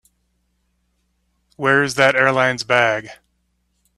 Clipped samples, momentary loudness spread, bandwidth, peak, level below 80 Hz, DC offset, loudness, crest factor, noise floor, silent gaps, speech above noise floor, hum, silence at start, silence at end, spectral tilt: under 0.1%; 7 LU; 13.5 kHz; 0 dBFS; -60 dBFS; under 0.1%; -16 LUFS; 20 dB; -68 dBFS; none; 51 dB; none; 1.6 s; 0.85 s; -4 dB/octave